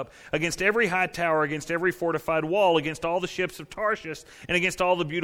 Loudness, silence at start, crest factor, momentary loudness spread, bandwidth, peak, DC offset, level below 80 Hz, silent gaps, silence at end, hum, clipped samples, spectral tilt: -25 LUFS; 0 s; 18 dB; 8 LU; 17.5 kHz; -8 dBFS; under 0.1%; -54 dBFS; none; 0 s; none; under 0.1%; -4.5 dB/octave